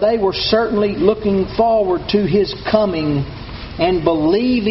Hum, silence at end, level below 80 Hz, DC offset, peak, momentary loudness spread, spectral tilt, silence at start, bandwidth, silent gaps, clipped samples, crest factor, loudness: none; 0 s; -36 dBFS; under 0.1%; 0 dBFS; 5 LU; -5 dB/octave; 0 s; 6 kHz; none; under 0.1%; 16 dB; -16 LUFS